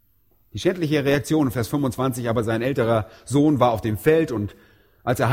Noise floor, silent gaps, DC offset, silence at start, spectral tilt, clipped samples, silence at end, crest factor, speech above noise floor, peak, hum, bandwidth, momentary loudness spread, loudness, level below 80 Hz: -63 dBFS; none; under 0.1%; 0.55 s; -6.5 dB/octave; under 0.1%; 0 s; 18 dB; 42 dB; -4 dBFS; none; 16.5 kHz; 7 LU; -22 LUFS; -50 dBFS